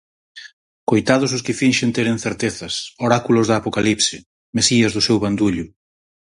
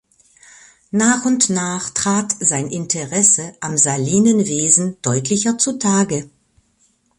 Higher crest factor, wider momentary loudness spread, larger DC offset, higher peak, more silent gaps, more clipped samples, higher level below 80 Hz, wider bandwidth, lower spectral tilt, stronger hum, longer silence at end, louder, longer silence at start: about the same, 20 dB vs 18 dB; about the same, 10 LU vs 8 LU; neither; about the same, 0 dBFS vs 0 dBFS; first, 0.53-0.87 s, 4.26-4.53 s vs none; neither; first, -50 dBFS vs -56 dBFS; about the same, 11.5 kHz vs 11.5 kHz; about the same, -4 dB/octave vs -3.5 dB/octave; neither; second, 0.7 s vs 0.9 s; about the same, -18 LUFS vs -16 LUFS; second, 0.35 s vs 0.95 s